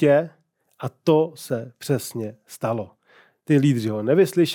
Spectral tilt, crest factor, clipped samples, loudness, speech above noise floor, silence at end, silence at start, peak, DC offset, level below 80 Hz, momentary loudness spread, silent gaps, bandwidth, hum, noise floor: -6.5 dB/octave; 16 dB; under 0.1%; -22 LUFS; 35 dB; 0 s; 0 s; -6 dBFS; under 0.1%; -78 dBFS; 16 LU; none; 19 kHz; none; -56 dBFS